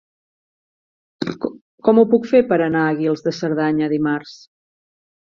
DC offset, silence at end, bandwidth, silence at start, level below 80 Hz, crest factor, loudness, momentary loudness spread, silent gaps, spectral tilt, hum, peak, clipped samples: under 0.1%; 0.85 s; 7.2 kHz; 1.2 s; -60 dBFS; 18 dB; -18 LUFS; 13 LU; 1.61-1.78 s; -7.5 dB/octave; none; -2 dBFS; under 0.1%